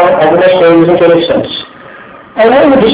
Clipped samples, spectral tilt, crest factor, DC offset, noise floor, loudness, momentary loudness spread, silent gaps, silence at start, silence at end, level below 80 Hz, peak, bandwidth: 5%; -10 dB/octave; 8 dB; under 0.1%; -31 dBFS; -7 LUFS; 13 LU; none; 0 s; 0 s; -40 dBFS; 0 dBFS; 4 kHz